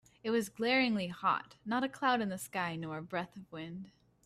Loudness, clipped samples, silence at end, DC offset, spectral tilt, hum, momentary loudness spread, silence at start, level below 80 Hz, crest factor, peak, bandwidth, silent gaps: -34 LUFS; under 0.1%; 0.35 s; under 0.1%; -4.5 dB/octave; none; 16 LU; 0.25 s; -74 dBFS; 18 dB; -16 dBFS; 15 kHz; none